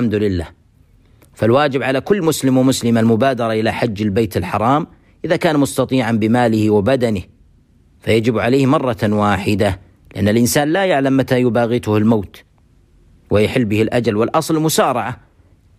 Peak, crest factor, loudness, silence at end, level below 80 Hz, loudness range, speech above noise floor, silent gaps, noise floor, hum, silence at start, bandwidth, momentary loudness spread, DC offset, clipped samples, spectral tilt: -4 dBFS; 14 dB; -16 LUFS; 0.65 s; -46 dBFS; 2 LU; 37 dB; none; -52 dBFS; none; 0 s; 15.5 kHz; 6 LU; under 0.1%; under 0.1%; -6 dB/octave